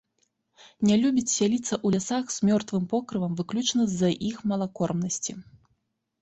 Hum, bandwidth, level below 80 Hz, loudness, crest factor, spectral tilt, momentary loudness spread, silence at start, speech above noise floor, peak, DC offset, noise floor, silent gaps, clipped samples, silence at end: none; 8.2 kHz; -62 dBFS; -26 LUFS; 16 dB; -5 dB/octave; 6 LU; 0.65 s; 49 dB; -10 dBFS; under 0.1%; -75 dBFS; none; under 0.1%; 0.8 s